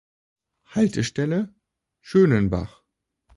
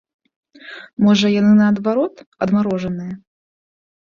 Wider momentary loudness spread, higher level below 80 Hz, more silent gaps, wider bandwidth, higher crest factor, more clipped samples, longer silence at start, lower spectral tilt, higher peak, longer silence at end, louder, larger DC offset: second, 13 LU vs 20 LU; first, -46 dBFS vs -56 dBFS; second, none vs 0.93-0.97 s, 2.27-2.32 s; first, 11.5 kHz vs 7.2 kHz; about the same, 18 dB vs 14 dB; neither; about the same, 0.75 s vs 0.65 s; about the same, -7 dB/octave vs -6.5 dB/octave; about the same, -6 dBFS vs -4 dBFS; second, 0.7 s vs 0.9 s; second, -22 LUFS vs -16 LUFS; neither